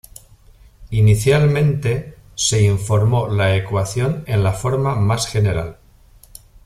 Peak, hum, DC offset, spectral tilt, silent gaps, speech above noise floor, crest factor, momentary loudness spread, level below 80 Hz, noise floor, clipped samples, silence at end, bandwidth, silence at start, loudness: -2 dBFS; none; under 0.1%; -5.5 dB/octave; none; 32 dB; 16 dB; 8 LU; -38 dBFS; -48 dBFS; under 0.1%; 0.95 s; 14 kHz; 0.8 s; -18 LUFS